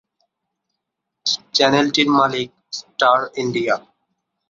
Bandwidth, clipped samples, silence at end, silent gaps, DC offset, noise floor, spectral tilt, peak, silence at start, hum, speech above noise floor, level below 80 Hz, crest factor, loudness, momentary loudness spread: 7.6 kHz; under 0.1%; 0.7 s; none; under 0.1%; -80 dBFS; -3.5 dB/octave; -2 dBFS; 1.25 s; none; 62 dB; -64 dBFS; 18 dB; -18 LUFS; 12 LU